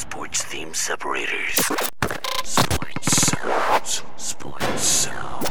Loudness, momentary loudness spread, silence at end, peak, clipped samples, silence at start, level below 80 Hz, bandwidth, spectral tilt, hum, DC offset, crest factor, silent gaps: -22 LUFS; 9 LU; 0 s; -4 dBFS; under 0.1%; 0 s; -44 dBFS; over 20 kHz; -2 dB/octave; none; 6%; 18 dB; none